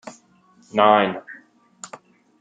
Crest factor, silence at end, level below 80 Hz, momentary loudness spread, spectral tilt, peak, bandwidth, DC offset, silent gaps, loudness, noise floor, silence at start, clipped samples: 22 dB; 0.55 s; -74 dBFS; 26 LU; -4.5 dB/octave; -2 dBFS; 9.4 kHz; under 0.1%; none; -18 LUFS; -56 dBFS; 0.05 s; under 0.1%